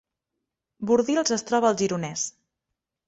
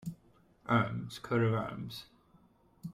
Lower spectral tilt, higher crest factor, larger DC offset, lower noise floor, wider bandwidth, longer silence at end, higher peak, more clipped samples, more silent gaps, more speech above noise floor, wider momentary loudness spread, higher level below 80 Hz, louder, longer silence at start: second, -4 dB/octave vs -7 dB/octave; about the same, 20 dB vs 18 dB; neither; first, -84 dBFS vs -65 dBFS; second, 8.2 kHz vs 15 kHz; first, 0.75 s vs 0 s; first, -8 dBFS vs -16 dBFS; neither; neither; first, 61 dB vs 33 dB; second, 9 LU vs 17 LU; about the same, -66 dBFS vs -66 dBFS; first, -24 LUFS vs -34 LUFS; first, 0.8 s vs 0 s